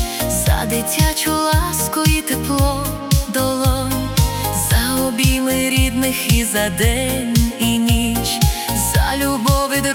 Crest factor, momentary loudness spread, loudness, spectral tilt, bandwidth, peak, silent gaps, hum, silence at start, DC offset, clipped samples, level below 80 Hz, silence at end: 14 dB; 3 LU; -17 LUFS; -4 dB/octave; 18 kHz; -2 dBFS; none; none; 0 s; under 0.1%; under 0.1%; -24 dBFS; 0 s